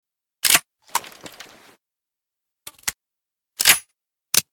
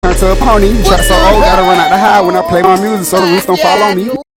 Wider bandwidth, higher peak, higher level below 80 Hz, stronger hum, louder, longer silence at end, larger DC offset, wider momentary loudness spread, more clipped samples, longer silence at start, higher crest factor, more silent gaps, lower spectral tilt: first, 19.5 kHz vs 17 kHz; about the same, 0 dBFS vs 0 dBFS; second, -60 dBFS vs -16 dBFS; neither; second, -19 LUFS vs -8 LUFS; about the same, 0.1 s vs 0.15 s; neither; first, 24 LU vs 3 LU; second, under 0.1% vs 1%; first, 0.45 s vs 0.05 s; first, 26 dB vs 8 dB; neither; second, 1.5 dB/octave vs -4.5 dB/octave